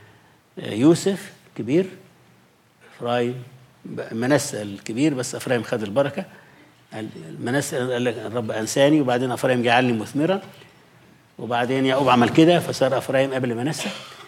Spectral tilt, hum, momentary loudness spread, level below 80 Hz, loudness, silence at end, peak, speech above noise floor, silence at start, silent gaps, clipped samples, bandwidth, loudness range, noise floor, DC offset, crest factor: -5 dB/octave; none; 17 LU; -68 dBFS; -21 LUFS; 0 s; -4 dBFS; 35 dB; 0.55 s; none; under 0.1%; 16 kHz; 6 LU; -56 dBFS; under 0.1%; 18 dB